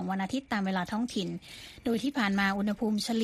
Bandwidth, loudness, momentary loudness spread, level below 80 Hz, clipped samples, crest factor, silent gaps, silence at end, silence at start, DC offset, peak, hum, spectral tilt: 15 kHz; -31 LUFS; 10 LU; -60 dBFS; under 0.1%; 16 dB; none; 0 s; 0 s; under 0.1%; -14 dBFS; none; -5 dB/octave